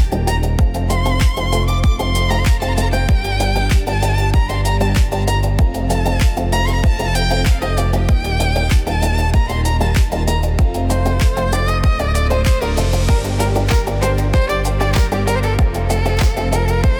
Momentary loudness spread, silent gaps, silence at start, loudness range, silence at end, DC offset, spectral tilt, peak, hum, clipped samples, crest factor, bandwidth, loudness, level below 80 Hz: 2 LU; none; 0 s; 0 LU; 0 s; under 0.1%; -5.5 dB/octave; -4 dBFS; none; under 0.1%; 10 dB; 19 kHz; -17 LUFS; -18 dBFS